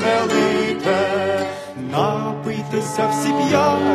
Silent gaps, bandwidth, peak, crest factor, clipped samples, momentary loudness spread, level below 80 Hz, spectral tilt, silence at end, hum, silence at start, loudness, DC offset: none; 13.5 kHz; -4 dBFS; 14 dB; under 0.1%; 8 LU; -58 dBFS; -5 dB/octave; 0 s; none; 0 s; -19 LUFS; under 0.1%